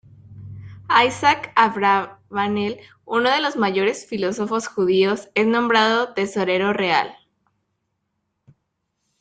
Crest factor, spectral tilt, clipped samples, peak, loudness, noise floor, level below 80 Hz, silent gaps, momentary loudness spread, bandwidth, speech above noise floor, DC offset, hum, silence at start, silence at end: 20 dB; -4.5 dB/octave; under 0.1%; 0 dBFS; -20 LUFS; -75 dBFS; -62 dBFS; none; 11 LU; 9.2 kHz; 55 dB; under 0.1%; none; 0.25 s; 2.1 s